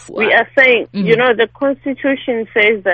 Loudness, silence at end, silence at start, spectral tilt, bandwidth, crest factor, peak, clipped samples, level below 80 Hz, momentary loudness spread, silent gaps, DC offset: -13 LUFS; 0 s; 0.1 s; -6 dB/octave; 8.4 kHz; 14 dB; 0 dBFS; under 0.1%; -54 dBFS; 8 LU; none; under 0.1%